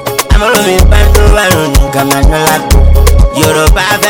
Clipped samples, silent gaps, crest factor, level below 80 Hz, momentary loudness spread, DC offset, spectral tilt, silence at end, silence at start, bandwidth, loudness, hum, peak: 10%; none; 6 dB; -8 dBFS; 3 LU; under 0.1%; -4.5 dB/octave; 0 s; 0 s; over 20 kHz; -8 LUFS; none; 0 dBFS